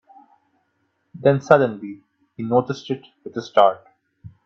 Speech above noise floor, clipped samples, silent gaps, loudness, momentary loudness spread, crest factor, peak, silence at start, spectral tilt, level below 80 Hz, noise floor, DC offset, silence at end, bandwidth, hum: 50 dB; under 0.1%; none; -19 LUFS; 17 LU; 22 dB; 0 dBFS; 1.15 s; -7 dB/octave; -66 dBFS; -70 dBFS; under 0.1%; 0.15 s; 7.6 kHz; none